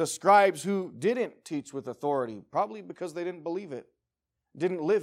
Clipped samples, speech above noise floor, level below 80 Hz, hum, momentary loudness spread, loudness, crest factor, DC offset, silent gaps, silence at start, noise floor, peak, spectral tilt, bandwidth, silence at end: under 0.1%; 58 dB; -80 dBFS; none; 17 LU; -29 LUFS; 20 dB; under 0.1%; none; 0 s; -86 dBFS; -10 dBFS; -5 dB/octave; 16 kHz; 0 s